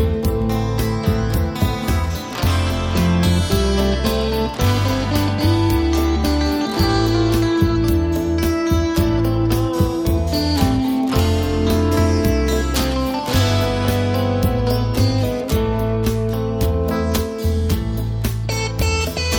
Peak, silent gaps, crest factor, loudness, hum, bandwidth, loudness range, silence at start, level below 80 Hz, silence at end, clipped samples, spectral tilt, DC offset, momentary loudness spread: -2 dBFS; none; 16 dB; -19 LUFS; none; over 20 kHz; 2 LU; 0 s; -26 dBFS; 0 s; under 0.1%; -6 dB/octave; under 0.1%; 4 LU